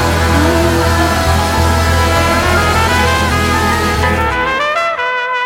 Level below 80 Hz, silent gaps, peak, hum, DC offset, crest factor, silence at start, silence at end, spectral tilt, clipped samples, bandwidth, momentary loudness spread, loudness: -22 dBFS; none; 0 dBFS; none; under 0.1%; 12 dB; 0 s; 0 s; -4.5 dB/octave; under 0.1%; 17 kHz; 3 LU; -12 LUFS